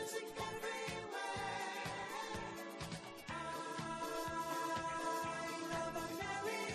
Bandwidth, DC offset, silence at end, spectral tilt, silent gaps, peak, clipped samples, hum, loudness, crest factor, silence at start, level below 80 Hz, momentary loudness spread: 13 kHz; under 0.1%; 0 s; -3.5 dB/octave; none; -28 dBFS; under 0.1%; none; -43 LUFS; 14 dB; 0 s; -66 dBFS; 6 LU